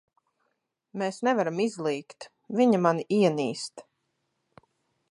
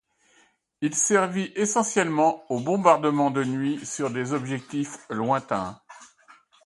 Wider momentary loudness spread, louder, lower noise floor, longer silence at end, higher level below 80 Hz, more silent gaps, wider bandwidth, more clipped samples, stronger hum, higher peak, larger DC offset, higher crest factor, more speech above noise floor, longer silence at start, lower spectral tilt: first, 16 LU vs 10 LU; about the same, -26 LUFS vs -24 LUFS; first, -78 dBFS vs -63 dBFS; first, 1.3 s vs 0.6 s; second, -78 dBFS vs -66 dBFS; neither; about the same, 11.5 kHz vs 11.5 kHz; neither; neither; second, -8 dBFS vs -4 dBFS; neither; about the same, 20 dB vs 22 dB; first, 52 dB vs 39 dB; first, 0.95 s vs 0.8 s; first, -6 dB/octave vs -4.5 dB/octave